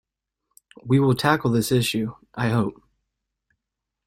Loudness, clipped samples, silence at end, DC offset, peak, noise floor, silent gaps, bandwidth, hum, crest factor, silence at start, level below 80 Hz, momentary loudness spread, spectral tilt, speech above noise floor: -22 LUFS; under 0.1%; 1.35 s; under 0.1%; -4 dBFS; -84 dBFS; none; 16.5 kHz; none; 20 dB; 0.85 s; -56 dBFS; 10 LU; -6 dB/octave; 63 dB